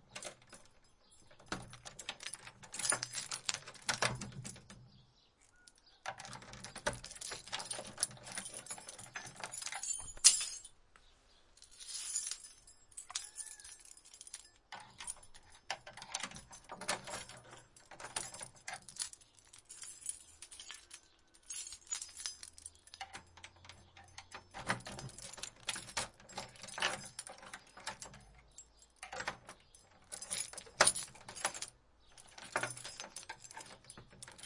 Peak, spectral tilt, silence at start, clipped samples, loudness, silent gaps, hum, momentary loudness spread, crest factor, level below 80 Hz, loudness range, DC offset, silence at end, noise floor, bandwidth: -4 dBFS; -0.5 dB/octave; 0 s; under 0.1%; -40 LUFS; none; none; 19 LU; 38 dB; -68 dBFS; 13 LU; under 0.1%; 0 s; -69 dBFS; 11.5 kHz